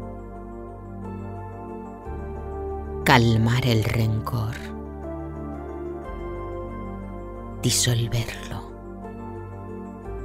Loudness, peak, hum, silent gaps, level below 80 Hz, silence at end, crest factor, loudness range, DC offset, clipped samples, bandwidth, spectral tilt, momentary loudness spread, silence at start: -26 LUFS; -2 dBFS; none; none; -40 dBFS; 0 s; 26 dB; 9 LU; under 0.1%; under 0.1%; 16 kHz; -4.5 dB/octave; 17 LU; 0 s